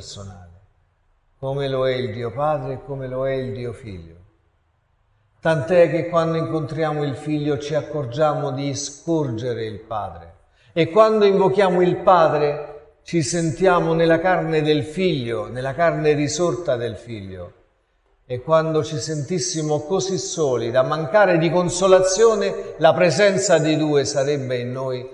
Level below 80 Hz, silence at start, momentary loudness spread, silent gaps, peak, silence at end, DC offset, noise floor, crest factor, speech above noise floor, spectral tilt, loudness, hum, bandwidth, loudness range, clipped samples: -50 dBFS; 0 s; 14 LU; none; 0 dBFS; 0 s; under 0.1%; -64 dBFS; 20 dB; 44 dB; -5 dB/octave; -20 LUFS; none; 11 kHz; 8 LU; under 0.1%